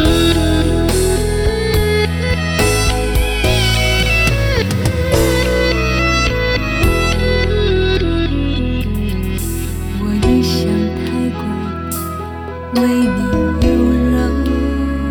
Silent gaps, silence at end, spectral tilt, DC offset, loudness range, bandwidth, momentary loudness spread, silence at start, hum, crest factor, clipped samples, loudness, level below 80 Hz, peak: none; 0 s; -5 dB/octave; under 0.1%; 4 LU; over 20 kHz; 7 LU; 0 s; none; 14 dB; under 0.1%; -15 LUFS; -20 dBFS; 0 dBFS